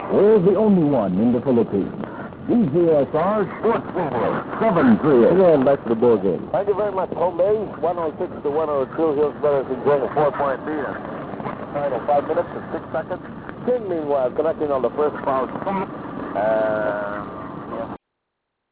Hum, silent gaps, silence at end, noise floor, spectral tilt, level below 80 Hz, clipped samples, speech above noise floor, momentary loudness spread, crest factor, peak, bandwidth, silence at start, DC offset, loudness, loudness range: none; none; 0.75 s; -78 dBFS; -11.5 dB/octave; -52 dBFS; under 0.1%; 58 dB; 15 LU; 14 dB; -6 dBFS; 4 kHz; 0 s; under 0.1%; -20 LUFS; 7 LU